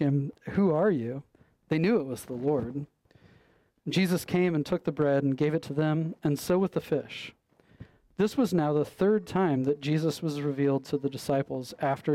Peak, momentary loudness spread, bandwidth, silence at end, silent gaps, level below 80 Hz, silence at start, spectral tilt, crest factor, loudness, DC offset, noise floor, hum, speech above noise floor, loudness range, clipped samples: -16 dBFS; 10 LU; 16 kHz; 0 s; none; -62 dBFS; 0 s; -7 dB/octave; 12 dB; -28 LUFS; under 0.1%; -64 dBFS; none; 37 dB; 3 LU; under 0.1%